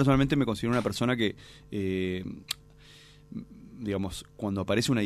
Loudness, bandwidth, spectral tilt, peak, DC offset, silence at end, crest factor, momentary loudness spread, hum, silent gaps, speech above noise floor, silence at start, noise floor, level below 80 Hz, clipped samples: -30 LUFS; 15 kHz; -6 dB/octave; -10 dBFS; under 0.1%; 0 s; 20 dB; 17 LU; 50 Hz at -55 dBFS; none; 25 dB; 0 s; -53 dBFS; -50 dBFS; under 0.1%